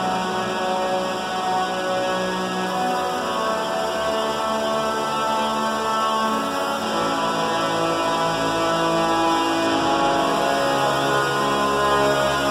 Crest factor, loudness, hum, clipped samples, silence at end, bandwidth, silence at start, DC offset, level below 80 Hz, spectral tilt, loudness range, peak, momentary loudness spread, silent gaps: 14 dB; -21 LUFS; none; under 0.1%; 0 s; 16 kHz; 0 s; under 0.1%; -50 dBFS; -3.5 dB/octave; 3 LU; -6 dBFS; 4 LU; none